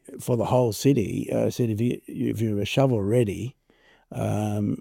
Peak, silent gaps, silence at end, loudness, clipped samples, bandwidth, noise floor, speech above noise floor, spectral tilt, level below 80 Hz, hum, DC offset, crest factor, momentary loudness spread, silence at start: -8 dBFS; none; 0 s; -25 LUFS; under 0.1%; 17 kHz; -60 dBFS; 36 dB; -7 dB/octave; -56 dBFS; none; under 0.1%; 16 dB; 7 LU; 0.1 s